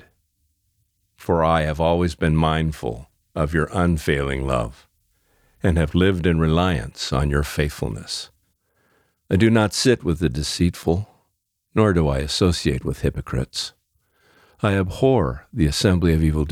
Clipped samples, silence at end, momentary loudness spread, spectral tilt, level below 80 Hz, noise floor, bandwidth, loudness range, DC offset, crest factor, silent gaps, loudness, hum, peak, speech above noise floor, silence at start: under 0.1%; 0 s; 10 LU; -6 dB/octave; -34 dBFS; -73 dBFS; 15.5 kHz; 2 LU; under 0.1%; 18 dB; none; -21 LUFS; none; -4 dBFS; 53 dB; 1.2 s